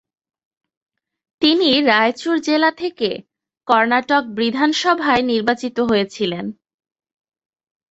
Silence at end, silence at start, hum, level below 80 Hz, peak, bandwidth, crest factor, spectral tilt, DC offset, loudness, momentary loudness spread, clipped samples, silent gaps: 1.4 s; 1.4 s; none; -58 dBFS; -2 dBFS; 8.2 kHz; 18 dB; -4 dB/octave; under 0.1%; -17 LUFS; 9 LU; under 0.1%; none